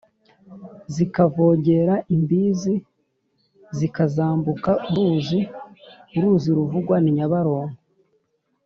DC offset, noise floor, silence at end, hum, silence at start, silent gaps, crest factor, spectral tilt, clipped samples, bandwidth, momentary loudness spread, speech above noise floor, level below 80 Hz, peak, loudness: under 0.1%; -69 dBFS; 0.9 s; none; 0.5 s; none; 18 dB; -8.5 dB/octave; under 0.1%; 7.2 kHz; 12 LU; 49 dB; -58 dBFS; -4 dBFS; -21 LUFS